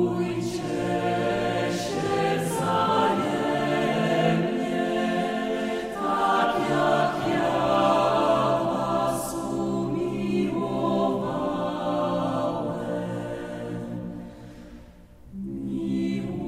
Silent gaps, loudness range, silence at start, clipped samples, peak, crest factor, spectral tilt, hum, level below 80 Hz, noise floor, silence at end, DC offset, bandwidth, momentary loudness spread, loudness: none; 8 LU; 0 s; under 0.1%; -10 dBFS; 16 dB; -6 dB/octave; none; -54 dBFS; -48 dBFS; 0 s; under 0.1%; 16 kHz; 11 LU; -25 LUFS